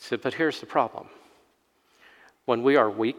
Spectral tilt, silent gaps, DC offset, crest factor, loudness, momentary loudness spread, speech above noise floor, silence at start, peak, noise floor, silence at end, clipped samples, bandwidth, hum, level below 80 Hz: -5.5 dB/octave; none; under 0.1%; 20 dB; -25 LUFS; 12 LU; 42 dB; 0 s; -6 dBFS; -67 dBFS; 0 s; under 0.1%; 14 kHz; none; -78 dBFS